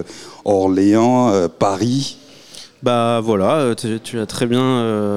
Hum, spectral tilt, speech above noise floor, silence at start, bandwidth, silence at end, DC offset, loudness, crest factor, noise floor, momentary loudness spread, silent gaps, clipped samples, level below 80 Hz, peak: none; -6 dB/octave; 24 dB; 0 s; 14.5 kHz; 0 s; 0.6%; -17 LUFS; 14 dB; -40 dBFS; 12 LU; none; under 0.1%; -56 dBFS; -2 dBFS